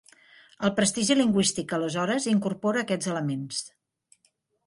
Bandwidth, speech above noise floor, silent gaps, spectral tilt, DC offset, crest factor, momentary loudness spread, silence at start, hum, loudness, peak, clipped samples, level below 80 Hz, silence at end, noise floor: 11.5 kHz; 45 dB; none; -4 dB/octave; under 0.1%; 18 dB; 9 LU; 0.6 s; none; -26 LUFS; -8 dBFS; under 0.1%; -64 dBFS; 1 s; -71 dBFS